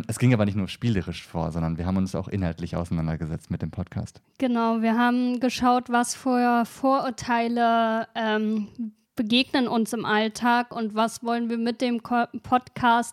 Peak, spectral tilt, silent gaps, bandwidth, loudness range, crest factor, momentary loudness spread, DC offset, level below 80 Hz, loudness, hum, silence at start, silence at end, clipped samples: -6 dBFS; -5.5 dB/octave; none; 14.5 kHz; 5 LU; 18 dB; 10 LU; under 0.1%; -52 dBFS; -25 LUFS; none; 0 s; 0 s; under 0.1%